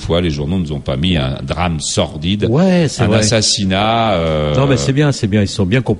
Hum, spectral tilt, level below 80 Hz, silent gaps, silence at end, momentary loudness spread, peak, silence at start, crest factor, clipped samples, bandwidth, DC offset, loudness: none; -5 dB/octave; -32 dBFS; none; 0 s; 6 LU; 0 dBFS; 0 s; 14 dB; under 0.1%; 11.5 kHz; under 0.1%; -14 LUFS